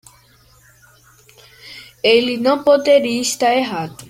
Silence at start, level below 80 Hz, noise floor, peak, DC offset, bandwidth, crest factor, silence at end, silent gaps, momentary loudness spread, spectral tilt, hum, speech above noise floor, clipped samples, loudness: 1.65 s; -60 dBFS; -51 dBFS; 0 dBFS; under 0.1%; 16 kHz; 18 dB; 0.05 s; none; 21 LU; -3 dB/octave; none; 36 dB; under 0.1%; -15 LUFS